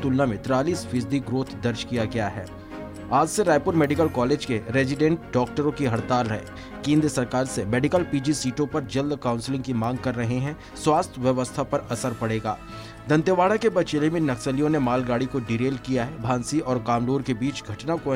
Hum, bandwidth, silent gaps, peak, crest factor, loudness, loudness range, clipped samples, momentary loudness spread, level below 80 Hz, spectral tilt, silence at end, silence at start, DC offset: none; 16 kHz; none; -8 dBFS; 16 dB; -24 LUFS; 3 LU; under 0.1%; 8 LU; -48 dBFS; -6 dB/octave; 0 s; 0 s; under 0.1%